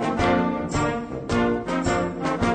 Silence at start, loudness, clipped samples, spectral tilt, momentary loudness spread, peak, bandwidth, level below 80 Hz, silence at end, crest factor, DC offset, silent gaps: 0 s; -24 LUFS; under 0.1%; -6 dB/octave; 5 LU; -10 dBFS; 9.4 kHz; -40 dBFS; 0 s; 14 dB; under 0.1%; none